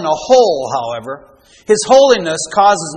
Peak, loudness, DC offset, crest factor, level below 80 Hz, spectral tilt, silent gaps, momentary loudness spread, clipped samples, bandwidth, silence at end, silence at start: 0 dBFS; -12 LUFS; under 0.1%; 12 dB; -52 dBFS; -3 dB/octave; none; 16 LU; 0.1%; 10 kHz; 0 s; 0 s